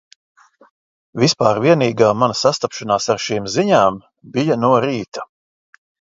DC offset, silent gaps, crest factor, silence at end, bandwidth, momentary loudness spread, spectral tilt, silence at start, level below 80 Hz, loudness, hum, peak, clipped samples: under 0.1%; 5.08-5.12 s; 18 dB; 0.9 s; 7.8 kHz; 14 LU; -5 dB/octave; 1.15 s; -56 dBFS; -16 LUFS; none; 0 dBFS; under 0.1%